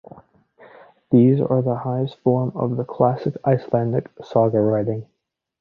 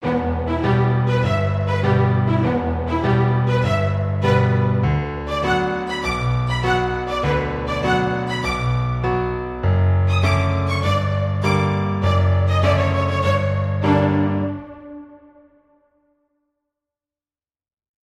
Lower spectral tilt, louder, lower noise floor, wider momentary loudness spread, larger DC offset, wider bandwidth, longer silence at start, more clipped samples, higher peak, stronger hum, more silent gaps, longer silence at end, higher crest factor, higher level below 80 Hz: first, -11 dB/octave vs -7.5 dB/octave; about the same, -20 LUFS vs -19 LUFS; second, -51 dBFS vs under -90 dBFS; first, 8 LU vs 5 LU; neither; second, 5 kHz vs 10 kHz; first, 1.1 s vs 0 s; neither; about the same, -2 dBFS vs -4 dBFS; neither; neither; second, 0.6 s vs 2.85 s; about the same, 18 dB vs 14 dB; second, -58 dBFS vs -36 dBFS